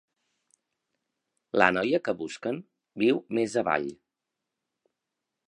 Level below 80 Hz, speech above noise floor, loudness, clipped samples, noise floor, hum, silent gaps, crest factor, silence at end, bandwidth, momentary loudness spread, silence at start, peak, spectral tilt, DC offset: -70 dBFS; 59 dB; -27 LUFS; under 0.1%; -86 dBFS; none; none; 28 dB; 1.55 s; 10.5 kHz; 13 LU; 1.55 s; -2 dBFS; -5 dB/octave; under 0.1%